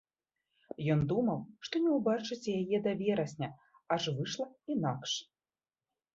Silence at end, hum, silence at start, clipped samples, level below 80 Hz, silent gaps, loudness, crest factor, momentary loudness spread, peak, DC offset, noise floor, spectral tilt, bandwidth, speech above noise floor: 0.9 s; none; 0.8 s; under 0.1%; -68 dBFS; none; -34 LUFS; 18 dB; 9 LU; -16 dBFS; under 0.1%; under -90 dBFS; -6 dB/octave; 7.8 kHz; over 57 dB